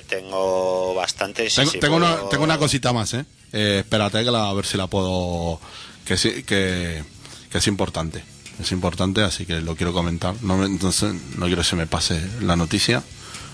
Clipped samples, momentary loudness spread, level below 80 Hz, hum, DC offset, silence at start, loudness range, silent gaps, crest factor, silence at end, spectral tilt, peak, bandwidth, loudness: under 0.1%; 11 LU; -42 dBFS; none; under 0.1%; 0 s; 4 LU; none; 18 dB; 0 s; -4 dB/octave; -4 dBFS; 11 kHz; -21 LUFS